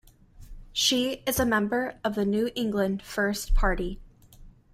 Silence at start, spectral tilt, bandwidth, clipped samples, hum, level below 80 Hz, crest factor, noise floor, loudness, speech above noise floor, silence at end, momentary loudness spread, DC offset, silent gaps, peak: 0.4 s; -3.5 dB/octave; 16 kHz; under 0.1%; none; -34 dBFS; 18 dB; -50 dBFS; -27 LUFS; 25 dB; 0.25 s; 8 LU; under 0.1%; none; -8 dBFS